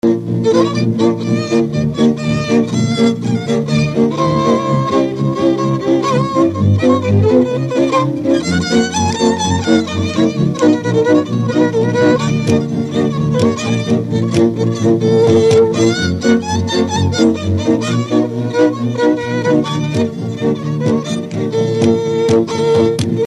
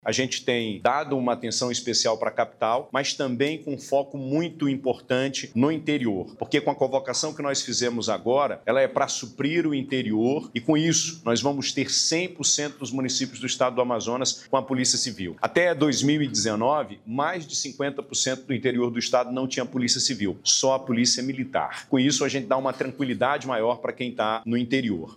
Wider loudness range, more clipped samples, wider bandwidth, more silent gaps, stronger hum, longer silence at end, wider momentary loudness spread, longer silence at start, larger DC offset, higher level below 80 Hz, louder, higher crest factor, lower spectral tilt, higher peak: about the same, 3 LU vs 3 LU; neither; second, 11.5 kHz vs 13.5 kHz; neither; neither; about the same, 0 s vs 0 s; about the same, 4 LU vs 6 LU; about the same, 0.05 s vs 0.05 s; neither; first, -44 dBFS vs -68 dBFS; first, -14 LUFS vs -24 LUFS; about the same, 14 dB vs 18 dB; first, -6.5 dB/octave vs -3.5 dB/octave; first, 0 dBFS vs -8 dBFS